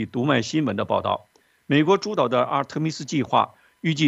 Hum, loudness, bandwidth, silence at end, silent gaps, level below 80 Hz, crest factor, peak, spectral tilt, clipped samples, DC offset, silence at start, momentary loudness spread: none; -23 LUFS; 8.2 kHz; 0 s; none; -66 dBFS; 18 dB; -4 dBFS; -5.5 dB/octave; under 0.1%; under 0.1%; 0 s; 7 LU